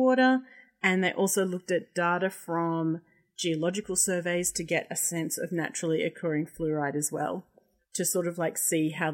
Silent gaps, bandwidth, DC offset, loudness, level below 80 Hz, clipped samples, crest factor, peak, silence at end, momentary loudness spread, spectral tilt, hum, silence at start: none; 16.5 kHz; under 0.1%; -28 LUFS; -66 dBFS; under 0.1%; 20 dB; -8 dBFS; 0 s; 6 LU; -4 dB/octave; none; 0 s